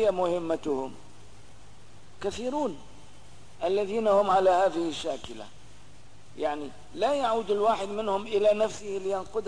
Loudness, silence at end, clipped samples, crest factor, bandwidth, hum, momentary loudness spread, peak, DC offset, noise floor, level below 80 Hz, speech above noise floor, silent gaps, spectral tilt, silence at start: -28 LUFS; 0 s; under 0.1%; 16 dB; 10.5 kHz; none; 15 LU; -12 dBFS; 0.8%; -54 dBFS; -58 dBFS; 27 dB; none; -5 dB/octave; 0 s